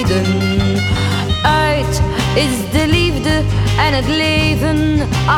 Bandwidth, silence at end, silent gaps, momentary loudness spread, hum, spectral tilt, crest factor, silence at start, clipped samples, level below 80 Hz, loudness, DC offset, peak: 16.5 kHz; 0 s; none; 3 LU; none; -5.5 dB/octave; 12 dB; 0 s; under 0.1%; -24 dBFS; -14 LUFS; under 0.1%; -2 dBFS